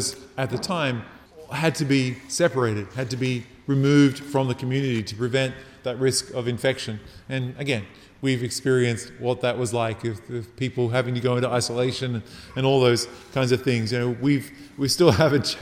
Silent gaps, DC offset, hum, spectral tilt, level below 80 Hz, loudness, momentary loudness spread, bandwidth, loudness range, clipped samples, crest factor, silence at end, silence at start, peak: none; under 0.1%; none; -5 dB/octave; -56 dBFS; -24 LUFS; 12 LU; 15.5 kHz; 3 LU; under 0.1%; 20 dB; 0 s; 0 s; -4 dBFS